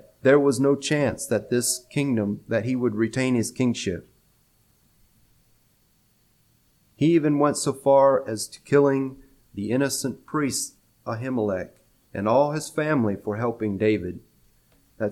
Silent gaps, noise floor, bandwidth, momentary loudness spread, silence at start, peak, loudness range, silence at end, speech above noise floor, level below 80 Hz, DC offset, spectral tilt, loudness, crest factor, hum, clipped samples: none; -64 dBFS; 16 kHz; 12 LU; 0.25 s; -6 dBFS; 7 LU; 0 s; 41 dB; -60 dBFS; under 0.1%; -5 dB/octave; -23 LUFS; 18 dB; none; under 0.1%